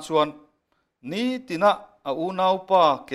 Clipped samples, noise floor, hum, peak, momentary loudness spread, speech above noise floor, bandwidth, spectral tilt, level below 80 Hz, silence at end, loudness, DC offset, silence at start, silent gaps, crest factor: under 0.1%; -72 dBFS; none; -6 dBFS; 12 LU; 49 dB; 13 kHz; -5 dB/octave; -68 dBFS; 0 s; -23 LUFS; under 0.1%; 0 s; none; 16 dB